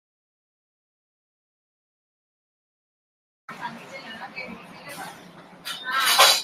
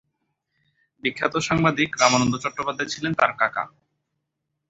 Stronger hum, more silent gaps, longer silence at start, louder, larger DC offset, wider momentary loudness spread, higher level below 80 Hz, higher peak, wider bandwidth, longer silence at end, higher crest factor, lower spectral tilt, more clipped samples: neither; neither; first, 3.5 s vs 1.05 s; about the same, -20 LUFS vs -22 LUFS; neither; first, 23 LU vs 10 LU; second, -78 dBFS vs -56 dBFS; about the same, -2 dBFS vs -2 dBFS; first, 16 kHz vs 8.2 kHz; second, 0 s vs 1 s; about the same, 26 dB vs 22 dB; second, 0.5 dB/octave vs -4 dB/octave; neither